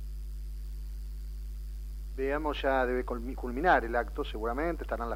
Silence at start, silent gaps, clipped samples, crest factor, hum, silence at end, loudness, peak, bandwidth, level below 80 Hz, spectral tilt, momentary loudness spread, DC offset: 0 s; none; under 0.1%; 22 dB; none; 0 s; -33 LUFS; -10 dBFS; 16 kHz; -38 dBFS; -6.5 dB/octave; 16 LU; under 0.1%